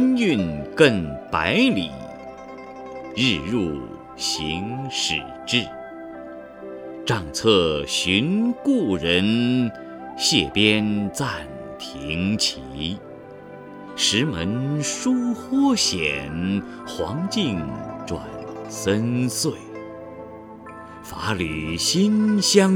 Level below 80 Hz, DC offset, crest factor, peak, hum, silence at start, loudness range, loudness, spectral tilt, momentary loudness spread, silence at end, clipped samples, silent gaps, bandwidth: -48 dBFS; under 0.1%; 22 dB; 0 dBFS; none; 0 s; 6 LU; -22 LUFS; -4 dB/octave; 19 LU; 0 s; under 0.1%; none; 17 kHz